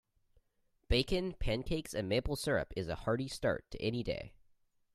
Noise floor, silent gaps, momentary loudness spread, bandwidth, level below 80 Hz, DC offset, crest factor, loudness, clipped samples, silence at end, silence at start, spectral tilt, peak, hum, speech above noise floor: -76 dBFS; none; 6 LU; 15 kHz; -46 dBFS; under 0.1%; 22 dB; -36 LUFS; under 0.1%; 0.65 s; 0.9 s; -5.5 dB/octave; -14 dBFS; none; 41 dB